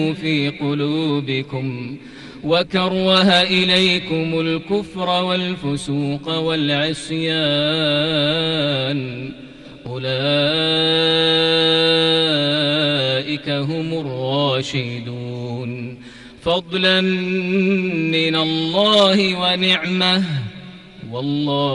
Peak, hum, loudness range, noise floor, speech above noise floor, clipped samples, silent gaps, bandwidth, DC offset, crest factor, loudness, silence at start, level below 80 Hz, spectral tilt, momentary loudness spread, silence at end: -4 dBFS; none; 5 LU; -39 dBFS; 21 dB; under 0.1%; none; 11.5 kHz; under 0.1%; 16 dB; -17 LUFS; 0 s; -52 dBFS; -5.5 dB/octave; 14 LU; 0 s